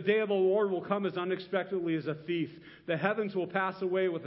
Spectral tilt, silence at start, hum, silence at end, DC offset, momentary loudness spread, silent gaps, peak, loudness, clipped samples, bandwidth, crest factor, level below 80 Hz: -10 dB/octave; 0 s; none; 0 s; under 0.1%; 7 LU; none; -12 dBFS; -31 LUFS; under 0.1%; 5.8 kHz; 18 dB; -76 dBFS